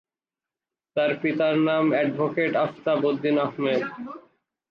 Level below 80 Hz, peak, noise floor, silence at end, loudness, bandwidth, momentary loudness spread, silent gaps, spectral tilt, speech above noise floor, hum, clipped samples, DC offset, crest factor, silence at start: -74 dBFS; -12 dBFS; under -90 dBFS; 0.5 s; -24 LUFS; 6.2 kHz; 11 LU; none; -8 dB/octave; over 67 dB; none; under 0.1%; under 0.1%; 14 dB; 0.95 s